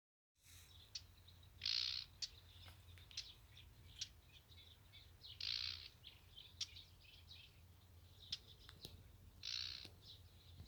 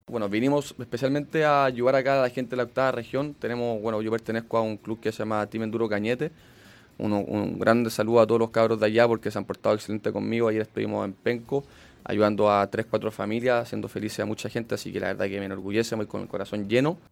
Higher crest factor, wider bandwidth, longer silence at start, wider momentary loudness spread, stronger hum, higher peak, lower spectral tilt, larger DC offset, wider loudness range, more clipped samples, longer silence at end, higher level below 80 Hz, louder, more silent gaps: first, 26 dB vs 20 dB; first, over 20 kHz vs 16.5 kHz; first, 0.4 s vs 0.1 s; first, 21 LU vs 10 LU; neither; second, -28 dBFS vs -6 dBFS; second, -1 dB/octave vs -6 dB/octave; neither; about the same, 7 LU vs 5 LU; neither; second, 0 s vs 0.15 s; second, -72 dBFS vs -62 dBFS; second, -48 LUFS vs -26 LUFS; neither